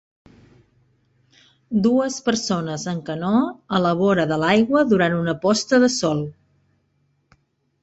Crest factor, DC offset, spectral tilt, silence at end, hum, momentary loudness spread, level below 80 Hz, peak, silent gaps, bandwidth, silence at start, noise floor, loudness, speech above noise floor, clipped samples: 18 dB; under 0.1%; -5 dB/octave; 1.5 s; none; 9 LU; -58 dBFS; -4 dBFS; none; 8.2 kHz; 1.7 s; -66 dBFS; -20 LUFS; 47 dB; under 0.1%